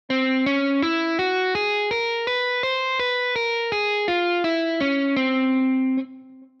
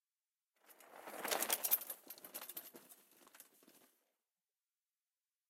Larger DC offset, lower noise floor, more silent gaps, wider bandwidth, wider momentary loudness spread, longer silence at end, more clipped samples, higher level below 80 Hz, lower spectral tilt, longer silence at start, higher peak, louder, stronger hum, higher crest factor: neither; second, -44 dBFS vs under -90 dBFS; neither; second, 7 kHz vs 16.5 kHz; second, 2 LU vs 26 LU; second, 0.15 s vs 1.7 s; neither; first, -64 dBFS vs under -90 dBFS; first, -4.5 dB/octave vs 0.5 dB/octave; second, 0.1 s vs 0.7 s; first, -12 dBFS vs -18 dBFS; first, -22 LUFS vs -40 LUFS; neither; second, 10 dB vs 30 dB